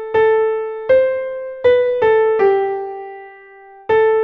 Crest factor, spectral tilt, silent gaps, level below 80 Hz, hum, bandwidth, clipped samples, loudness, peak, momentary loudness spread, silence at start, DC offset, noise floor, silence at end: 12 dB; -6.5 dB/octave; none; -54 dBFS; none; 4.8 kHz; under 0.1%; -16 LUFS; -4 dBFS; 16 LU; 0 s; under 0.1%; -41 dBFS; 0 s